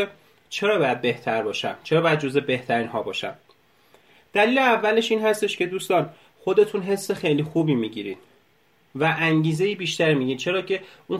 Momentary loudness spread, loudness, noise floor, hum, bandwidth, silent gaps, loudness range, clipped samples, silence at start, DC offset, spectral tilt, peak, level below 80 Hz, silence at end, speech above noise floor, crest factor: 10 LU; -23 LUFS; -62 dBFS; none; 15 kHz; none; 3 LU; under 0.1%; 0 s; under 0.1%; -5.5 dB/octave; -6 dBFS; -68 dBFS; 0 s; 39 dB; 18 dB